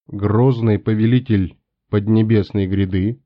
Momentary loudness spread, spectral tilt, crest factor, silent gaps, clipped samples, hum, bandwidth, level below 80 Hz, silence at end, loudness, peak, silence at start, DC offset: 5 LU; -8.5 dB/octave; 12 dB; none; under 0.1%; none; 5.2 kHz; -48 dBFS; 0.1 s; -17 LUFS; -4 dBFS; 0.1 s; under 0.1%